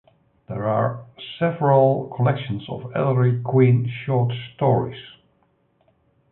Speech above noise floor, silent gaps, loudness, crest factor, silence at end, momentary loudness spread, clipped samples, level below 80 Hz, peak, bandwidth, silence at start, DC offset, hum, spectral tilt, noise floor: 44 dB; none; -21 LUFS; 18 dB; 1.25 s; 13 LU; under 0.1%; -58 dBFS; -4 dBFS; 4.1 kHz; 0.5 s; under 0.1%; none; -12.5 dB/octave; -64 dBFS